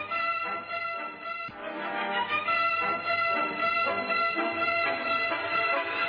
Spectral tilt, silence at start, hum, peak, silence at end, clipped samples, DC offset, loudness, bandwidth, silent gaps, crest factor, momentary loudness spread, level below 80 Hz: -5.5 dB/octave; 0 s; none; -16 dBFS; 0 s; under 0.1%; under 0.1%; -28 LUFS; 5.2 kHz; none; 12 dB; 9 LU; -70 dBFS